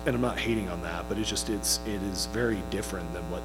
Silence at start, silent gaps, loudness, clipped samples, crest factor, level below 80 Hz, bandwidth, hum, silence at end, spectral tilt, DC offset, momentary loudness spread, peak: 0 s; none; -30 LUFS; under 0.1%; 18 dB; -40 dBFS; 17.5 kHz; 60 Hz at -40 dBFS; 0 s; -4 dB/octave; under 0.1%; 7 LU; -12 dBFS